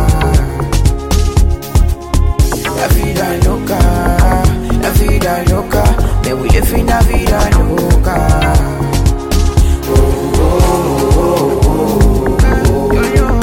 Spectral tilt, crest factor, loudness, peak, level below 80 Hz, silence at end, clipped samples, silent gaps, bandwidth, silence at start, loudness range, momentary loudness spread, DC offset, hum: -6 dB/octave; 10 dB; -12 LUFS; 0 dBFS; -14 dBFS; 0 s; under 0.1%; none; 17 kHz; 0 s; 2 LU; 3 LU; under 0.1%; none